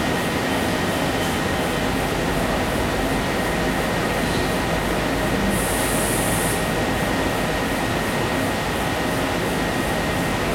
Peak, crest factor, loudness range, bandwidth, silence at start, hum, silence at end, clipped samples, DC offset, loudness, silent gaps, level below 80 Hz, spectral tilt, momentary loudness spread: -8 dBFS; 14 dB; 1 LU; 16.5 kHz; 0 s; none; 0 s; under 0.1%; under 0.1%; -21 LUFS; none; -34 dBFS; -4.5 dB/octave; 2 LU